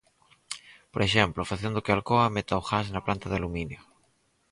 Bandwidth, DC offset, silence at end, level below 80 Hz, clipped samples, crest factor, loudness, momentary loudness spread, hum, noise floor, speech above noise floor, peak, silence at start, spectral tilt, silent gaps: 11.5 kHz; under 0.1%; 0.7 s; -48 dBFS; under 0.1%; 24 dB; -27 LUFS; 17 LU; none; -69 dBFS; 42 dB; -4 dBFS; 0.5 s; -5.5 dB/octave; none